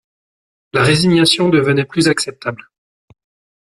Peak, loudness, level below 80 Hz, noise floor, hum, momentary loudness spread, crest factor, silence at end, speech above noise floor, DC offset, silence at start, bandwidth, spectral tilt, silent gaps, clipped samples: 0 dBFS; -14 LUFS; -50 dBFS; under -90 dBFS; none; 14 LU; 16 dB; 1.15 s; over 76 dB; under 0.1%; 0.75 s; 14 kHz; -4.5 dB/octave; none; under 0.1%